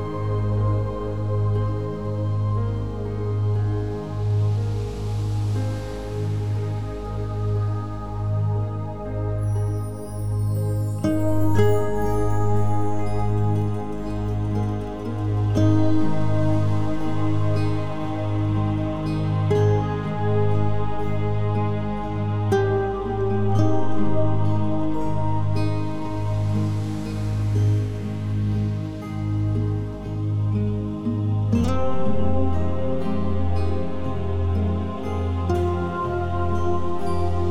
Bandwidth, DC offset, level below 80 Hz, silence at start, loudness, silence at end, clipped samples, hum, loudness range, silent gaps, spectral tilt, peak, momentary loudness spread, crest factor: 11 kHz; 2%; -36 dBFS; 0 s; -24 LUFS; 0 s; under 0.1%; none; 3 LU; none; -8.5 dB/octave; -6 dBFS; 7 LU; 14 dB